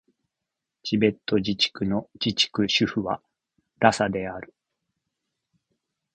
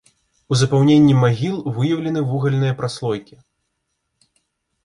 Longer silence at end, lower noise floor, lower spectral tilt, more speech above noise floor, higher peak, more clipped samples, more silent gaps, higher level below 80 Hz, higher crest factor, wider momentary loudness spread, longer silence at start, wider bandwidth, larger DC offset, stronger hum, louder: about the same, 1.7 s vs 1.6 s; first, -85 dBFS vs -74 dBFS; second, -4.5 dB/octave vs -7 dB/octave; first, 61 dB vs 57 dB; about the same, -2 dBFS vs -4 dBFS; neither; neither; about the same, -56 dBFS vs -54 dBFS; first, 26 dB vs 16 dB; about the same, 11 LU vs 11 LU; first, 0.85 s vs 0.5 s; second, 9.6 kHz vs 11 kHz; neither; neither; second, -24 LUFS vs -18 LUFS